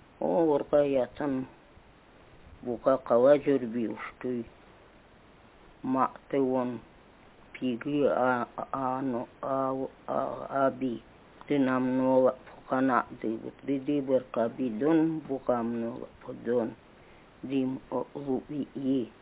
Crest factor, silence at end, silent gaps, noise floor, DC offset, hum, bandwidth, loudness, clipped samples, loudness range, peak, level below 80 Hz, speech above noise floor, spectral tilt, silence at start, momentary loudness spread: 20 dB; 0.1 s; none; -56 dBFS; under 0.1%; none; 4 kHz; -29 LUFS; under 0.1%; 5 LU; -10 dBFS; -64 dBFS; 28 dB; -10.5 dB/octave; 0.2 s; 12 LU